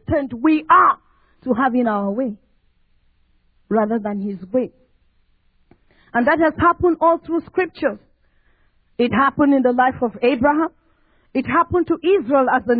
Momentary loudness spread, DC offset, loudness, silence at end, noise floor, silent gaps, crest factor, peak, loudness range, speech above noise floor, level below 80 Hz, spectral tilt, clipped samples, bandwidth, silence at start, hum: 10 LU; under 0.1%; -18 LUFS; 0 s; -59 dBFS; none; 16 dB; -2 dBFS; 7 LU; 42 dB; -50 dBFS; -10.5 dB/octave; under 0.1%; 4.9 kHz; 0.1 s; none